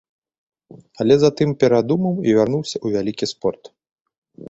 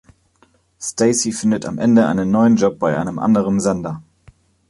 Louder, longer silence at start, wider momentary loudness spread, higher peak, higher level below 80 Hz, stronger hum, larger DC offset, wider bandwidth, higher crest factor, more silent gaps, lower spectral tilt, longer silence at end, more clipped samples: about the same, -19 LUFS vs -17 LUFS; first, 1 s vs 0.8 s; second, 9 LU vs 12 LU; about the same, -2 dBFS vs -2 dBFS; second, -56 dBFS vs -50 dBFS; neither; neither; second, 8 kHz vs 11.5 kHz; about the same, 18 dB vs 16 dB; first, 3.92-4.05 s, 4.18-4.22 s vs none; about the same, -6.5 dB/octave vs -5.5 dB/octave; second, 0.05 s vs 0.7 s; neither